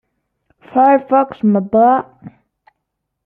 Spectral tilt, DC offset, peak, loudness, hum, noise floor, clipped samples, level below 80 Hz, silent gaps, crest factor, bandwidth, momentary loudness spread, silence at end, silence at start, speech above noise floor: -11 dB/octave; under 0.1%; -2 dBFS; -14 LUFS; none; -75 dBFS; under 0.1%; -60 dBFS; none; 14 dB; 3.9 kHz; 8 LU; 0.95 s; 0.75 s; 62 dB